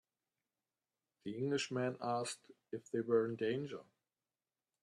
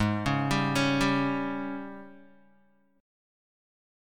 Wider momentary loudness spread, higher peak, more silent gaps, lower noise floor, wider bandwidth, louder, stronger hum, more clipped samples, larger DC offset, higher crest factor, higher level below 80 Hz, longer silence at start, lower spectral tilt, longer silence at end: about the same, 15 LU vs 15 LU; second, -22 dBFS vs -12 dBFS; neither; first, under -90 dBFS vs -66 dBFS; second, 12 kHz vs 16.5 kHz; second, -39 LUFS vs -28 LUFS; neither; neither; neither; about the same, 20 dB vs 18 dB; second, -84 dBFS vs -50 dBFS; first, 1.25 s vs 0 s; about the same, -5 dB/octave vs -5.5 dB/octave; about the same, 1 s vs 1.05 s